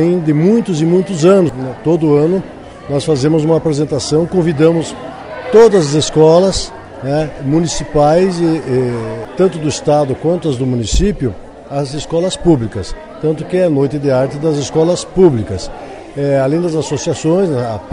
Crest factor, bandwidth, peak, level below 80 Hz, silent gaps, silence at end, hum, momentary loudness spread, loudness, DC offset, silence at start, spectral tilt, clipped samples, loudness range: 14 dB; 11 kHz; 0 dBFS; -32 dBFS; none; 0 s; none; 12 LU; -13 LUFS; under 0.1%; 0 s; -6.5 dB/octave; under 0.1%; 4 LU